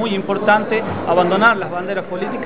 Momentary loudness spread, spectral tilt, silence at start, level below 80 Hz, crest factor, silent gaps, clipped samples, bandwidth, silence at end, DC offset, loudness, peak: 10 LU; -9.5 dB/octave; 0 s; -50 dBFS; 16 dB; none; under 0.1%; 4 kHz; 0 s; 1%; -17 LUFS; 0 dBFS